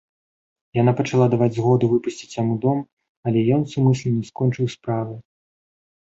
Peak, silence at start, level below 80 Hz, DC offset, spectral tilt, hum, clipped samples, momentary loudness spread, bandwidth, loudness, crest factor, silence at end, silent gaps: -4 dBFS; 0.75 s; -58 dBFS; under 0.1%; -8 dB/octave; none; under 0.1%; 10 LU; 8 kHz; -21 LUFS; 18 dB; 0.9 s; 2.92-2.97 s, 3.09-3.23 s